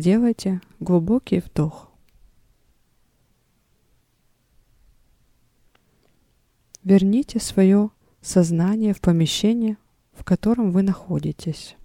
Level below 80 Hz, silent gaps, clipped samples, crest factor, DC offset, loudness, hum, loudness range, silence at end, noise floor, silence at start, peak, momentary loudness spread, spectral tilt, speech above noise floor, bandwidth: -48 dBFS; none; under 0.1%; 18 dB; under 0.1%; -21 LUFS; none; 9 LU; 0.15 s; -64 dBFS; 0 s; -4 dBFS; 11 LU; -6.5 dB/octave; 45 dB; 15.5 kHz